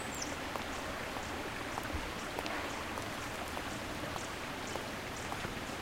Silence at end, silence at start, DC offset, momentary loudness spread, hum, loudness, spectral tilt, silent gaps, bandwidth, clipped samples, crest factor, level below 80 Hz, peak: 0 s; 0 s; under 0.1%; 2 LU; none; -39 LUFS; -3.5 dB/octave; none; 16.5 kHz; under 0.1%; 20 dB; -52 dBFS; -20 dBFS